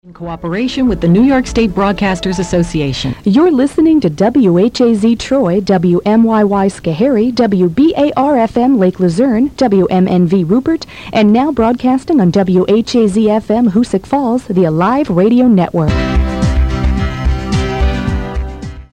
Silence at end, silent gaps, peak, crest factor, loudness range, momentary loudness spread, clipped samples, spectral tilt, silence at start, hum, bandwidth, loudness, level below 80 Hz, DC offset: 0.1 s; none; 0 dBFS; 10 dB; 2 LU; 6 LU; under 0.1%; -7 dB/octave; 0.05 s; none; 10.5 kHz; -12 LUFS; -24 dBFS; 0.3%